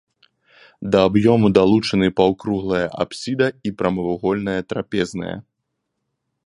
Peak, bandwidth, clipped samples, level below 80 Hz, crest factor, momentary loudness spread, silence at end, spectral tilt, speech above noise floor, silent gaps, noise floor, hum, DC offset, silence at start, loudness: 0 dBFS; 11 kHz; under 0.1%; -48 dBFS; 20 dB; 11 LU; 1.05 s; -6.5 dB/octave; 58 dB; none; -76 dBFS; none; under 0.1%; 0.8 s; -19 LUFS